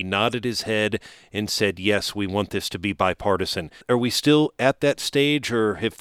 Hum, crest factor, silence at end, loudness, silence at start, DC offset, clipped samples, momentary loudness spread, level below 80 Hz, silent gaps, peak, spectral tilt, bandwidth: none; 20 dB; 0.05 s; -23 LUFS; 0 s; under 0.1%; under 0.1%; 8 LU; -52 dBFS; none; -4 dBFS; -4.5 dB/octave; 16.5 kHz